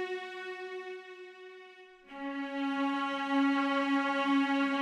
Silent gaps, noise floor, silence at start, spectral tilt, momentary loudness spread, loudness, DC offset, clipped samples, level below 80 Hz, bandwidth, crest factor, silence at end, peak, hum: none; -54 dBFS; 0 s; -3.5 dB/octave; 21 LU; -32 LUFS; under 0.1%; under 0.1%; -82 dBFS; 9.4 kHz; 14 dB; 0 s; -20 dBFS; none